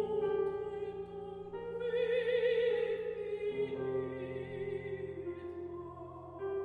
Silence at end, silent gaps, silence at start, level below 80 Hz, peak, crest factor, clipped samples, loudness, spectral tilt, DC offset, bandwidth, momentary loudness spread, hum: 0 s; none; 0 s; -66 dBFS; -22 dBFS; 14 dB; under 0.1%; -37 LUFS; -7.5 dB/octave; under 0.1%; 4.8 kHz; 13 LU; none